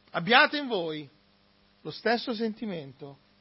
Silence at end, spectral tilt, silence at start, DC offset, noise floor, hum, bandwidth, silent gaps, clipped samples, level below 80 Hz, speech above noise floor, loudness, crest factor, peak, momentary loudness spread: 0.25 s; -8 dB/octave; 0.15 s; under 0.1%; -64 dBFS; none; 5.8 kHz; none; under 0.1%; -74 dBFS; 36 dB; -26 LUFS; 24 dB; -6 dBFS; 24 LU